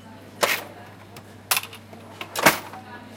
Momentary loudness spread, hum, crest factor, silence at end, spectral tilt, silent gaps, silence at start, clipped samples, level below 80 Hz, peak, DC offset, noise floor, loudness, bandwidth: 24 LU; none; 28 dB; 0 s; -2 dB/octave; none; 0.05 s; under 0.1%; -62 dBFS; 0 dBFS; under 0.1%; -44 dBFS; -23 LUFS; 17 kHz